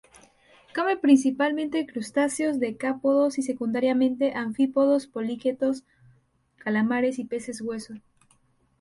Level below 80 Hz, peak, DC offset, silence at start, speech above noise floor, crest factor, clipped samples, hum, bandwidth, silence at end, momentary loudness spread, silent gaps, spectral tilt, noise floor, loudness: -68 dBFS; -8 dBFS; under 0.1%; 0.75 s; 40 dB; 18 dB; under 0.1%; none; 11.5 kHz; 0.8 s; 13 LU; none; -5 dB/octave; -64 dBFS; -25 LUFS